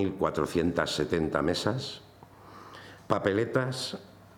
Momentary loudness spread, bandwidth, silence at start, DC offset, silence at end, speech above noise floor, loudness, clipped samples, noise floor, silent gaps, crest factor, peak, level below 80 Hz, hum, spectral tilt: 19 LU; 19 kHz; 0 s; under 0.1%; 0.25 s; 23 dB; -29 LUFS; under 0.1%; -52 dBFS; none; 20 dB; -10 dBFS; -56 dBFS; none; -5.5 dB/octave